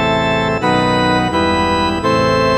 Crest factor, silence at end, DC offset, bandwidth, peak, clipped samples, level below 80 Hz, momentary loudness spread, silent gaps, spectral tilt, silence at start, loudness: 12 dB; 0 s; 0.3%; 13.5 kHz; -2 dBFS; under 0.1%; -34 dBFS; 2 LU; none; -5.5 dB/octave; 0 s; -14 LUFS